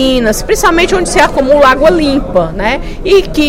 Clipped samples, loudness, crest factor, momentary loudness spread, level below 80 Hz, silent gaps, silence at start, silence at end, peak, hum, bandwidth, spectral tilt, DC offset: 0.9%; -9 LUFS; 8 dB; 7 LU; -22 dBFS; none; 0 s; 0 s; 0 dBFS; none; 16.5 kHz; -4 dB/octave; under 0.1%